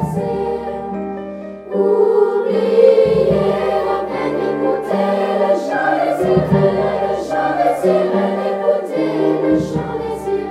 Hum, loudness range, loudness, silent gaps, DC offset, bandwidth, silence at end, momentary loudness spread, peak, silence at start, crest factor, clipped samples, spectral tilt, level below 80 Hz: none; 2 LU; -16 LUFS; none; under 0.1%; 13.5 kHz; 0 s; 10 LU; 0 dBFS; 0 s; 16 dB; under 0.1%; -7.5 dB/octave; -44 dBFS